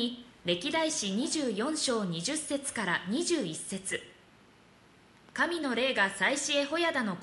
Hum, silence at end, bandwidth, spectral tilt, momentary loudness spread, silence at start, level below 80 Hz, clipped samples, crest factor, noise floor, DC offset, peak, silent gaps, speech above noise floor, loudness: none; 0 s; 11.5 kHz; -3 dB/octave; 8 LU; 0 s; -70 dBFS; under 0.1%; 18 dB; -59 dBFS; under 0.1%; -14 dBFS; none; 29 dB; -30 LUFS